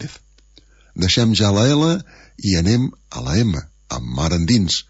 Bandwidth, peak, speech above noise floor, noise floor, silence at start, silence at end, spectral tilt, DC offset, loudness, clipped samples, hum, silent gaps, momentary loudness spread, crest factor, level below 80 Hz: 8 kHz; -4 dBFS; 33 dB; -50 dBFS; 0 s; 0.05 s; -5 dB/octave; under 0.1%; -18 LUFS; under 0.1%; none; none; 14 LU; 14 dB; -36 dBFS